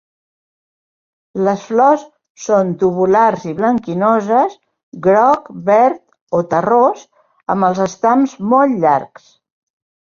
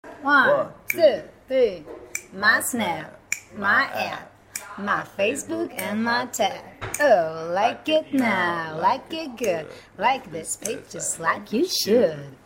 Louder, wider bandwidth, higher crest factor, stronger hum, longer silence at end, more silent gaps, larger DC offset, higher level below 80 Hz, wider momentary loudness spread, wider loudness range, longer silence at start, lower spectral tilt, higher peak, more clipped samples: first, -14 LUFS vs -23 LUFS; second, 7.4 kHz vs 16.5 kHz; about the same, 14 dB vs 18 dB; neither; first, 1.1 s vs 0.1 s; first, 2.30-2.35 s, 4.83-4.92 s, 6.21-6.27 s vs none; neither; about the same, -58 dBFS vs -60 dBFS; second, 8 LU vs 13 LU; about the same, 2 LU vs 3 LU; first, 1.35 s vs 0.05 s; first, -7 dB/octave vs -3 dB/octave; about the same, -2 dBFS vs -4 dBFS; neither